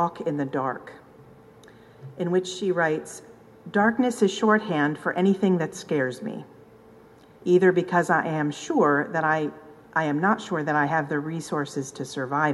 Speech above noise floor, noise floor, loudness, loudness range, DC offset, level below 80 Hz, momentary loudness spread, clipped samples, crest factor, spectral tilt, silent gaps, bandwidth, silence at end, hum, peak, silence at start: 27 dB; -51 dBFS; -24 LUFS; 4 LU; under 0.1%; -68 dBFS; 12 LU; under 0.1%; 18 dB; -6 dB/octave; none; 12 kHz; 0 s; none; -6 dBFS; 0 s